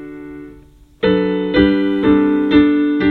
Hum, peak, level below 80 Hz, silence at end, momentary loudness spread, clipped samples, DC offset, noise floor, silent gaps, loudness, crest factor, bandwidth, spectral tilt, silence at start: none; 0 dBFS; -38 dBFS; 0 s; 20 LU; under 0.1%; under 0.1%; -43 dBFS; none; -14 LUFS; 14 dB; 4.3 kHz; -8.5 dB/octave; 0 s